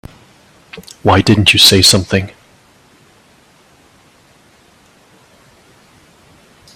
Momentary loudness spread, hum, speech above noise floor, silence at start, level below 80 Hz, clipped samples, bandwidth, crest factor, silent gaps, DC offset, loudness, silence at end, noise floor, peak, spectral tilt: 26 LU; none; 38 dB; 0.75 s; -44 dBFS; 0.1%; 16 kHz; 16 dB; none; under 0.1%; -9 LUFS; 4.45 s; -48 dBFS; 0 dBFS; -3.5 dB/octave